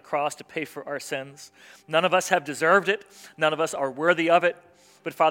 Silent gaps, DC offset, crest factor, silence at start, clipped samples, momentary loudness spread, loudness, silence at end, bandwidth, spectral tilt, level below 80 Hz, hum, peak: none; under 0.1%; 22 dB; 0.1 s; under 0.1%; 14 LU; -24 LUFS; 0 s; 17 kHz; -3.5 dB/octave; -78 dBFS; none; -4 dBFS